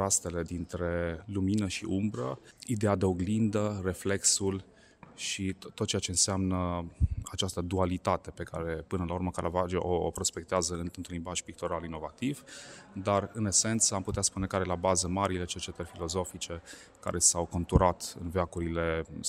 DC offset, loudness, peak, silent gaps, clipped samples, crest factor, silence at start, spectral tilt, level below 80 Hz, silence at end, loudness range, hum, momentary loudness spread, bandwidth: under 0.1%; -31 LUFS; -8 dBFS; none; under 0.1%; 22 dB; 0 s; -4 dB/octave; -48 dBFS; 0 s; 4 LU; none; 12 LU; 16 kHz